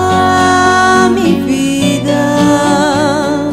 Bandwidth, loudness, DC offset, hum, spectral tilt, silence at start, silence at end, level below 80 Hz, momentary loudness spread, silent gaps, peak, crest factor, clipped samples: 14.5 kHz; -10 LUFS; under 0.1%; none; -4.5 dB/octave; 0 s; 0 s; -40 dBFS; 4 LU; none; 0 dBFS; 10 dB; under 0.1%